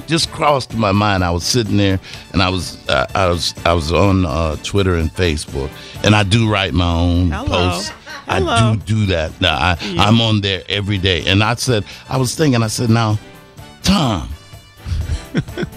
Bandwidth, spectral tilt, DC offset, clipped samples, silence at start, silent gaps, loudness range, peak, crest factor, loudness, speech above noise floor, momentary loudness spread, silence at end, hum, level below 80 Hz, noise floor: 14.5 kHz; -5 dB/octave; under 0.1%; under 0.1%; 0 s; none; 2 LU; 0 dBFS; 16 dB; -16 LUFS; 23 dB; 9 LU; 0 s; none; -30 dBFS; -39 dBFS